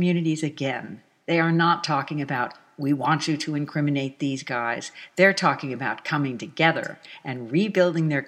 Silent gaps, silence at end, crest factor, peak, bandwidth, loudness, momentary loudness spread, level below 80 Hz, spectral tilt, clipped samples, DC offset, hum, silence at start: none; 0 s; 22 dB; -2 dBFS; 12 kHz; -24 LUFS; 12 LU; -80 dBFS; -5.5 dB/octave; under 0.1%; under 0.1%; none; 0 s